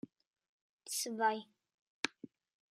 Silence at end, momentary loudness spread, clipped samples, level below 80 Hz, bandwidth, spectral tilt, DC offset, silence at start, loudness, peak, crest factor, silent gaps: 0.5 s; 23 LU; under 0.1%; under -90 dBFS; 14 kHz; -1.5 dB/octave; under 0.1%; 0.85 s; -38 LUFS; -14 dBFS; 28 dB; 1.74-2.03 s